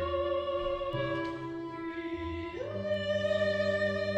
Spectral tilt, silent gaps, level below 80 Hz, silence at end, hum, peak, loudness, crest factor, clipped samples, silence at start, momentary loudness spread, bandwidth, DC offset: -6.5 dB/octave; none; -52 dBFS; 0 s; none; -18 dBFS; -33 LUFS; 14 dB; under 0.1%; 0 s; 9 LU; 8.8 kHz; under 0.1%